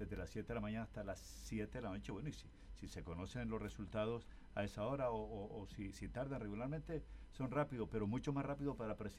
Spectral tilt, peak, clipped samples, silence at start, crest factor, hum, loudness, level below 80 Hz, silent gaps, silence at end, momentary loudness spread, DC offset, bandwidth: -7 dB/octave; -28 dBFS; under 0.1%; 0 s; 18 dB; none; -46 LUFS; -56 dBFS; none; 0 s; 9 LU; under 0.1%; 15.5 kHz